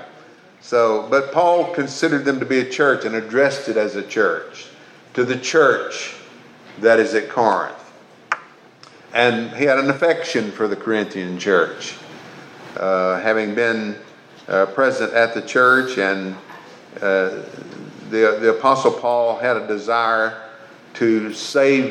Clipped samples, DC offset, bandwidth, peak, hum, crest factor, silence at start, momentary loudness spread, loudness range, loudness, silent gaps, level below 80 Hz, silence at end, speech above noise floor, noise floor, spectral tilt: under 0.1%; under 0.1%; 11 kHz; 0 dBFS; none; 18 dB; 0 s; 18 LU; 3 LU; -18 LUFS; none; -80 dBFS; 0 s; 28 dB; -46 dBFS; -4.5 dB/octave